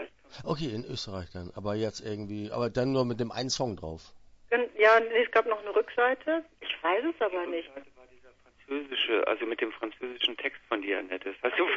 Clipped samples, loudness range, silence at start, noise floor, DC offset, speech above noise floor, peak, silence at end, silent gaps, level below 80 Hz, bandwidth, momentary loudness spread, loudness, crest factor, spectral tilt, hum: under 0.1%; 6 LU; 0 s; -59 dBFS; under 0.1%; 29 dB; -10 dBFS; 0 s; none; -60 dBFS; 8 kHz; 13 LU; -29 LUFS; 22 dB; -4.5 dB/octave; none